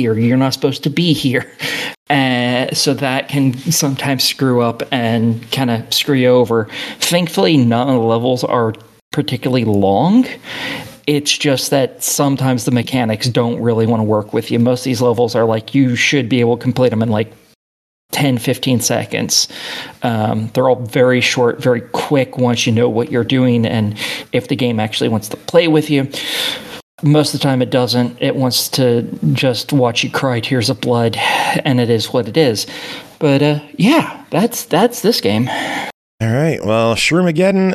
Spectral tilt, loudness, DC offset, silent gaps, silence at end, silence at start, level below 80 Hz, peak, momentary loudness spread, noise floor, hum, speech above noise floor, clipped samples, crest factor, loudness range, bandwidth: -5 dB/octave; -15 LUFS; under 0.1%; 1.97-2.06 s, 9.01-9.11 s, 17.55-18.09 s, 26.83-26.98 s, 35.94-36.18 s; 0 s; 0 s; -56 dBFS; 0 dBFS; 7 LU; under -90 dBFS; none; over 75 dB; under 0.1%; 14 dB; 2 LU; 15 kHz